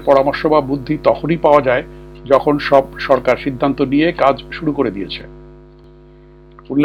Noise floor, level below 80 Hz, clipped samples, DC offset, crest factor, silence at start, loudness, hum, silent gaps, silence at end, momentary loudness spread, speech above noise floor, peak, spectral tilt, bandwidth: -42 dBFS; -40 dBFS; under 0.1%; under 0.1%; 16 dB; 0 s; -15 LUFS; 50 Hz at -40 dBFS; none; 0 s; 9 LU; 27 dB; 0 dBFS; -7.5 dB/octave; 7.8 kHz